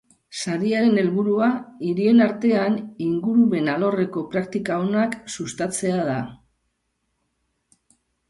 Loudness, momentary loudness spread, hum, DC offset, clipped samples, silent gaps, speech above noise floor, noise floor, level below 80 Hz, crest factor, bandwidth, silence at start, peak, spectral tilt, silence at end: -22 LUFS; 10 LU; none; under 0.1%; under 0.1%; none; 53 dB; -74 dBFS; -64 dBFS; 16 dB; 11.5 kHz; 0.3 s; -6 dBFS; -6 dB/octave; 1.95 s